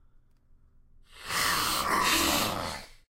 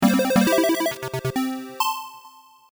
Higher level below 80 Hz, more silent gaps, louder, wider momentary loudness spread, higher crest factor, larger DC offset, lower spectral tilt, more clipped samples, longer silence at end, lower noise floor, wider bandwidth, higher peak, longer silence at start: first, -50 dBFS vs -56 dBFS; neither; second, -27 LUFS vs -22 LUFS; first, 15 LU vs 10 LU; about the same, 20 dB vs 16 dB; neither; second, -1.5 dB/octave vs -4.5 dB/octave; neither; second, 0.3 s vs 0.45 s; first, -59 dBFS vs -49 dBFS; second, 16 kHz vs over 20 kHz; second, -12 dBFS vs -8 dBFS; first, 1.1 s vs 0 s